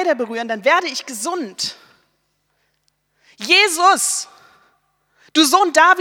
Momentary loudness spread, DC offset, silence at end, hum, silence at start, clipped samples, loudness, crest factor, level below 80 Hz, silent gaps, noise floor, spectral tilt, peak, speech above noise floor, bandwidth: 13 LU; under 0.1%; 0 s; none; 0 s; under 0.1%; -16 LUFS; 18 dB; -72 dBFS; none; -67 dBFS; -0.5 dB/octave; 0 dBFS; 51 dB; 18.5 kHz